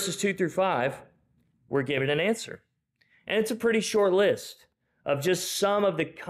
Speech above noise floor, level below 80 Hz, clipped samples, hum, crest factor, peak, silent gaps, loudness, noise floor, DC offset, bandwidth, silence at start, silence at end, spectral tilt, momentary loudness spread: 42 dB; -68 dBFS; under 0.1%; none; 14 dB; -14 dBFS; none; -26 LUFS; -68 dBFS; under 0.1%; 15.5 kHz; 0 s; 0 s; -4 dB/octave; 15 LU